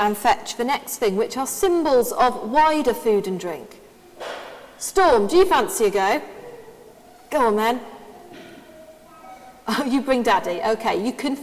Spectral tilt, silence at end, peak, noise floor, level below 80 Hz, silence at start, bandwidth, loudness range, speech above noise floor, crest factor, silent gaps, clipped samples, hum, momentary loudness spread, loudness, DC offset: -3.5 dB/octave; 0 s; -4 dBFS; -47 dBFS; -50 dBFS; 0 s; 16 kHz; 6 LU; 27 dB; 18 dB; none; under 0.1%; none; 19 LU; -20 LUFS; under 0.1%